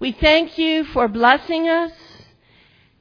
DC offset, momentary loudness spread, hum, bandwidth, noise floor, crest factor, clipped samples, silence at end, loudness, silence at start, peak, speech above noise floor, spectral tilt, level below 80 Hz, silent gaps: under 0.1%; 6 LU; none; 5.4 kHz; -54 dBFS; 18 dB; under 0.1%; 1.1 s; -17 LUFS; 0 s; 0 dBFS; 37 dB; -5.5 dB/octave; -38 dBFS; none